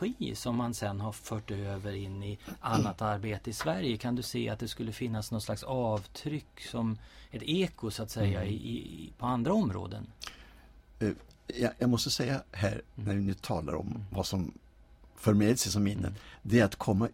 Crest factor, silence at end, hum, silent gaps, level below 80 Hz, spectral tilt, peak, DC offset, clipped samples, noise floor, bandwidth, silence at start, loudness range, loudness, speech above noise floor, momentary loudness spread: 20 dB; 0 s; none; none; -54 dBFS; -5.5 dB/octave; -12 dBFS; under 0.1%; under 0.1%; -57 dBFS; 16 kHz; 0 s; 3 LU; -33 LUFS; 25 dB; 12 LU